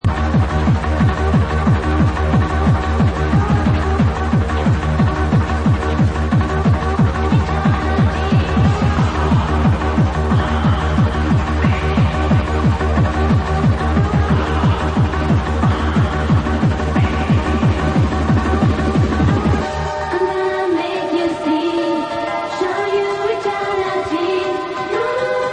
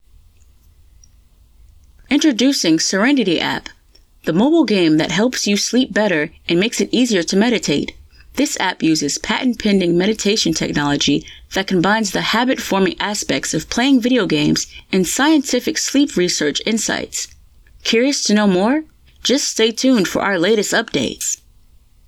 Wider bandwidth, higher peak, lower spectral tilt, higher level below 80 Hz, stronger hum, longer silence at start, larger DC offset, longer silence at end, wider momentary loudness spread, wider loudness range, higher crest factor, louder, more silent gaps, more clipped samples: second, 9.6 kHz vs 17.5 kHz; about the same, -2 dBFS vs -2 dBFS; first, -7.5 dB/octave vs -3.5 dB/octave; first, -24 dBFS vs -48 dBFS; neither; second, 0.05 s vs 2.1 s; neither; second, 0 s vs 0.75 s; second, 4 LU vs 7 LU; about the same, 3 LU vs 2 LU; about the same, 12 dB vs 14 dB; about the same, -17 LUFS vs -16 LUFS; neither; neither